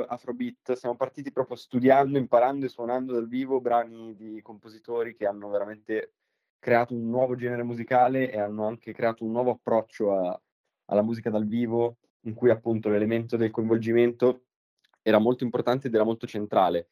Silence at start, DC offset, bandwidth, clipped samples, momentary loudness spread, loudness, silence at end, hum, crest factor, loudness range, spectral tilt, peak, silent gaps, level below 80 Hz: 0 s; under 0.1%; 14 kHz; under 0.1%; 11 LU; -26 LUFS; 0.1 s; none; 20 dB; 5 LU; -8 dB/octave; -6 dBFS; 6.50-6.60 s, 10.52-10.64 s, 12.10-12.20 s, 14.56-14.77 s; -76 dBFS